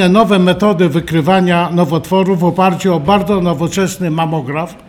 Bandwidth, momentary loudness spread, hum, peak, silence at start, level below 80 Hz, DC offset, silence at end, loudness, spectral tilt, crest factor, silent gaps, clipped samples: 15 kHz; 6 LU; none; -2 dBFS; 0 s; -42 dBFS; under 0.1%; 0.1 s; -13 LUFS; -6.5 dB/octave; 12 dB; none; under 0.1%